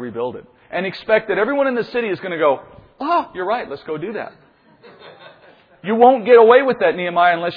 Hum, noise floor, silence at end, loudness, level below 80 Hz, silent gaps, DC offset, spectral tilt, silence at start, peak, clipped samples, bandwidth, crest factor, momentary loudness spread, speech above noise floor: none; -49 dBFS; 0 s; -17 LUFS; -60 dBFS; none; under 0.1%; -8 dB/octave; 0 s; 0 dBFS; under 0.1%; 5.2 kHz; 18 dB; 17 LU; 32 dB